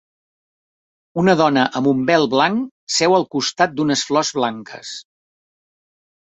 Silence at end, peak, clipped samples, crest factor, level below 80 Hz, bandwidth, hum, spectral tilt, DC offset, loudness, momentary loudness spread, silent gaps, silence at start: 1.4 s; -2 dBFS; under 0.1%; 18 dB; -60 dBFS; 8.4 kHz; none; -4 dB/octave; under 0.1%; -17 LUFS; 16 LU; 2.71-2.87 s; 1.15 s